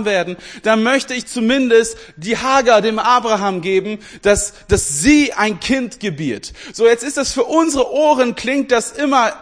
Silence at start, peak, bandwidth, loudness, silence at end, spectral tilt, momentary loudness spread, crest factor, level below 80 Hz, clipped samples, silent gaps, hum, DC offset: 0 s; 0 dBFS; 10.5 kHz; -15 LUFS; 0 s; -3.5 dB/octave; 10 LU; 16 dB; -38 dBFS; under 0.1%; none; none; 0.1%